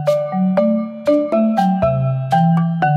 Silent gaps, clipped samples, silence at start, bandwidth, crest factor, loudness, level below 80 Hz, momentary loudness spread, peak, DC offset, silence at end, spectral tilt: none; under 0.1%; 0 s; 11 kHz; 10 dB; -16 LUFS; -46 dBFS; 3 LU; -4 dBFS; under 0.1%; 0 s; -9 dB/octave